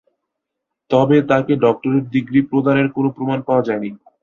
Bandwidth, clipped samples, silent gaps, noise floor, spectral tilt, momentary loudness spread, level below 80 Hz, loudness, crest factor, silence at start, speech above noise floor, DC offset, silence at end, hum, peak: 7 kHz; under 0.1%; none; -79 dBFS; -8.5 dB/octave; 8 LU; -56 dBFS; -17 LUFS; 16 dB; 0.9 s; 63 dB; under 0.1%; 0.25 s; none; -2 dBFS